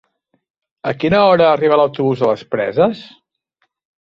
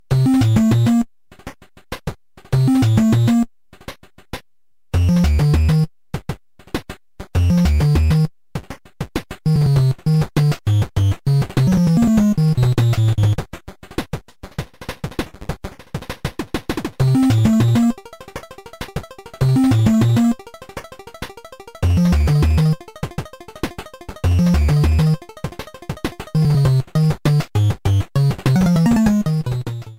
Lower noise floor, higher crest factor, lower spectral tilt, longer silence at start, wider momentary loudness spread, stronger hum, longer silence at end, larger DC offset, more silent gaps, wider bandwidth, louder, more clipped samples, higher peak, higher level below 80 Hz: second, -68 dBFS vs -78 dBFS; about the same, 16 dB vs 16 dB; about the same, -7.5 dB/octave vs -7.5 dB/octave; first, 0.85 s vs 0.1 s; second, 11 LU vs 20 LU; neither; first, 1 s vs 0.05 s; second, under 0.1% vs 0.3%; neither; second, 7.2 kHz vs 16 kHz; about the same, -15 LUFS vs -17 LUFS; neither; about the same, -2 dBFS vs -2 dBFS; second, -52 dBFS vs -28 dBFS